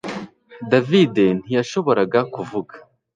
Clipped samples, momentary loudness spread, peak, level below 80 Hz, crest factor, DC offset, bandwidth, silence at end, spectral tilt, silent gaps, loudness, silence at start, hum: under 0.1%; 19 LU; -2 dBFS; -62 dBFS; 18 dB; under 0.1%; 9.2 kHz; 0.35 s; -6.5 dB/octave; none; -19 LUFS; 0.05 s; none